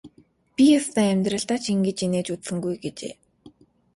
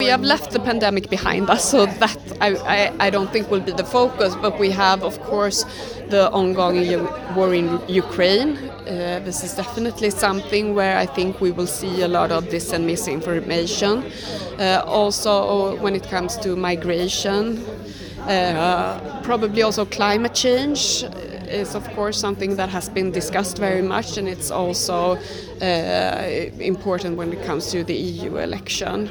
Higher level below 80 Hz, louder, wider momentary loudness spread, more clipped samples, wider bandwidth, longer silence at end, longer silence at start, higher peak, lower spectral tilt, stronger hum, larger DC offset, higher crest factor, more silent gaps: second, -62 dBFS vs -46 dBFS; second, -23 LUFS vs -20 LUFS; first, 16 LU vs 8 LU; neither; second, 11.5 kHz vs over 20 kHz; first, 0.45 s vs 0 s; about the same, 0.05 s vs 0 s; second, -8 dBFS vs 0 dBFS; about the same, -5 dB/octave vs -4 dB/octave; neither; neither; about the same, 16 dB vs 20 dB; neither